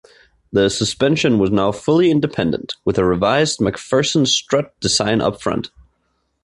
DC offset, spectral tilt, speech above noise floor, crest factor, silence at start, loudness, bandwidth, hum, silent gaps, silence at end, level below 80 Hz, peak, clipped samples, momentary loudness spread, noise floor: under 0.1%; -4.5 dB/octave; 50 dB; 16 dB; 0.5 s; -17 LUFS; 11.5 kHz; none; none; 0.75 s; -44 dBFS; -2 dBFS; under 0.1%; 7 LU; -67 dBFS